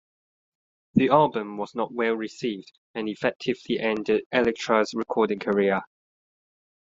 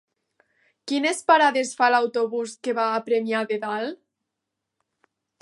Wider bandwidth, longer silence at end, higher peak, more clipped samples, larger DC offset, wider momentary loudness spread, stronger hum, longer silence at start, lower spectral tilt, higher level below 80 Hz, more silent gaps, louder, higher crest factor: second, 7.8 kHz vs 11.5 kHz; second, 0.95 s vs 1.45 s; about the same, -4 dBFS vs -4 dBFS; neither; neither; about the same, 11 LU vs 11 LU; neither; about the same, 0.95 s vs 0.85 s; first, -6 dB/octave vs -3 dB/octave; first, -62 dBFS vs -84 dBFS; first, 2.78-2.94 s, 3.36-3.40 s, 4.26-4.30 s vs none; about the same, -25 LUFS vs -23 LUFS; about the same, 22 dB vs 20 dB